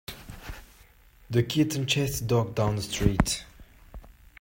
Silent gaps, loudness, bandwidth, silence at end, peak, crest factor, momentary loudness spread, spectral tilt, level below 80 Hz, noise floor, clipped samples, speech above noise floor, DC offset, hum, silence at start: none; -27 LUFS; 16.5 kHz; 0.3 s; -6 dBFS; 22 dB; 18 LU; -5 dB/octave; -40 dBFS; -56 dBFS; under 0.1%; 30 dB; under 0.1%; none; 0.1 s